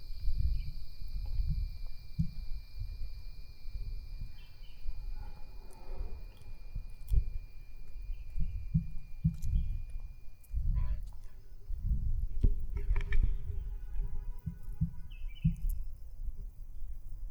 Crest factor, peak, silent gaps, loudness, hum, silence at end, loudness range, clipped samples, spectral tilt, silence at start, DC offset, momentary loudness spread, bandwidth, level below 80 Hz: 16 dB; -16 dBFS; none; -40 LUFS; none; 0 s; 10 LU; under 0.1%; -8 dB/octave; 0 s; under 0.1%; 16 LU; 5.4 kHz; -36 dBFS